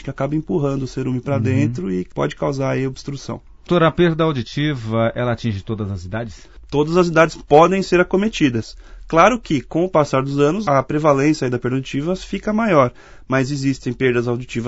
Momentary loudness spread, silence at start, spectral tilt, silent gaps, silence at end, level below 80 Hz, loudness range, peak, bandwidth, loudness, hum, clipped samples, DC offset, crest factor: 11 LU; 0 s; -6.5 dB/octave; none; 0 s; -42 dBFS; 4 LU; 0 dBFS; 8 kHz; -18 LUFS; none; under 0.1%; under 0.1%; 18 dB